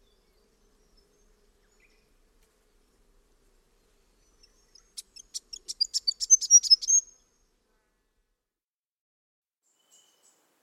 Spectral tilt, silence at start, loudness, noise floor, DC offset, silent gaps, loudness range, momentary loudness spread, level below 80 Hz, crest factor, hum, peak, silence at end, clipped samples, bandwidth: 5 dB/octave; 5.35 s; -20 LUFS; under -90 dBFS; under 0.1%; none; 13 LU; 28 LU; -68 dBFS; 24 dB; none; -8 dBFS; 3.6 s; under 0.1%; 16.5 kHz